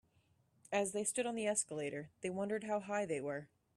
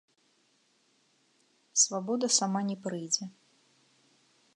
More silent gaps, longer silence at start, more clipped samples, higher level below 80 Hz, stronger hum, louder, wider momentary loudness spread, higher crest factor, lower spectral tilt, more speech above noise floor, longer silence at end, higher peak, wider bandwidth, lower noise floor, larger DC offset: neither; second, 0.7 s vs 1.75 s; neither; first, -80 dBFS vs -88 dBFS; neither; second, -39 LUFS vs -29 LUFS; about the same, 8 LU vs 9 LU; second, 18 dB vs 24 dB; about the same, -3.5 dB/octave vs -2.5 dB/octave; second, 36 dB vs 40 dB; second, 0.3 s vs 1.25 s; second, -22 dBFS vs -12 dBFS; first, 13.5 kHz vs 11.5 kHz; first, -75 dBFS vs -70 dBFS; neither